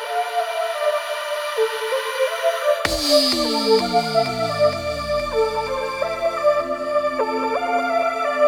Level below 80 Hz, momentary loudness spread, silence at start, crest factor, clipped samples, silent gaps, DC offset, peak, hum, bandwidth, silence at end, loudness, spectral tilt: -46 dBFS; 6 LU; 0 s; 20 dB; under 0.1%; none; under 0.1%; -2 dBFS; none; 19 kHz; 0 s; -21 LUFS; -3 dB/octave